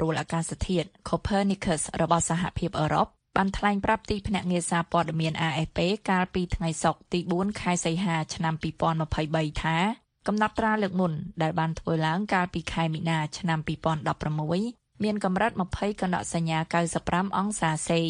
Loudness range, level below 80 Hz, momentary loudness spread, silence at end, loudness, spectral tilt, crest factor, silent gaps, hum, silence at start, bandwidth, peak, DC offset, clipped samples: 2 LU; -46 dBFS; 4 LU; 0 s; -27 LUFS; -5 dB/octave; 20 dB; none; none; 0 s; 10.5 kHz; -8 dBFS; under 0.1%; under 0.1%